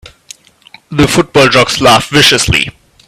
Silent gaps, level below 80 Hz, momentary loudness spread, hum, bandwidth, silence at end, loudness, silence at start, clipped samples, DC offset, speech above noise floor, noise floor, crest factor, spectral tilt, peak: none; -32 dBFS; 6 LU; none; over 20 kHz; 0.35 s; -8 LUFS; 0.9 s; 0.4%; under 0.1%; 33 dB; -41 dBFS; 10 dB; -3.5 dB/octave; 0 dBFS